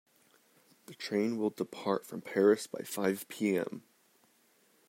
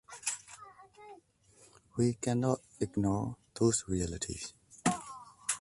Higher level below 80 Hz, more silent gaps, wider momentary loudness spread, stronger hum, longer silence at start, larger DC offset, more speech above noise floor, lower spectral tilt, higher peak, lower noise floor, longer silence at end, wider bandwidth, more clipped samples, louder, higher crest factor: second, -84 dBFS vs -56 dBFS; neither; second, 14 LU vs 22 LU; neither; first, 0.9 s vs 0.1 s; neither; first, 36 dB vs 31 dB; about the same, -5 dB/octave vs -5 dB/octave; about the same, -14 dBFS vs -14 dBFS; first, -69 dBFS vs -64 dBFS; first, 1.1 s vs 0 s; first, 16 kHz vs 11.5 kHz; neither; about the same, -33 LUFS vs -34 LUFS; about the same, 20 dB vs 20 dB